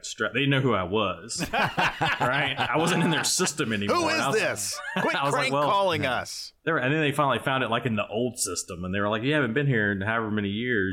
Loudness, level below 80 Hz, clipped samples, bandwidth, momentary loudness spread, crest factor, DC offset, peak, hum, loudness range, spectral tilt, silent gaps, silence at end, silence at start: -25 LUFS; -58 dBFS; under 0.1%; 17 kHz; 5 LU; 14 dB; under 0.1%; -12 dBFS; none; 2 LU; -4 dB/octave; none; 0 s; 0.05 s